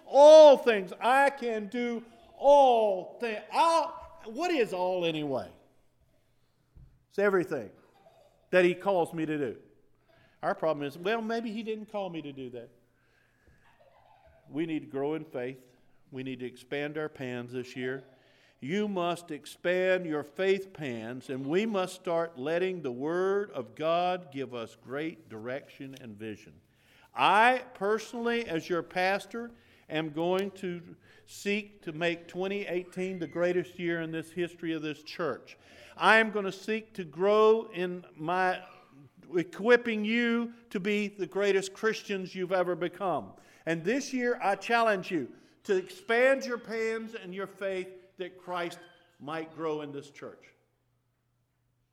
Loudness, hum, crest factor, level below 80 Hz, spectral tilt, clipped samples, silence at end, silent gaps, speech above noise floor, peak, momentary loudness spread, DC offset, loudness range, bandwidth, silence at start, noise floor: -29 LUFS; none; 22 dB; -72 dBFS; -5 dB/octave; under 0.1%; 1.55 s; none; 46 dB; -6 dBFS; 17 LU; under 0.1%; 11 LU; 14 kHz; 0.05 s; -75 dBFS